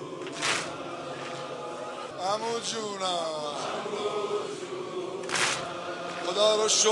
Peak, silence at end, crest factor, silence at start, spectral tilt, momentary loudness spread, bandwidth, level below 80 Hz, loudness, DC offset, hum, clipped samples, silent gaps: -10 dBFS; 0 s; 20 dB; 0 s; -1.5 dB/octave; 13 LU; 11.5 kHz; -74 dBFS; -30 LUFS; under 0.1%; none; under 0.1%; none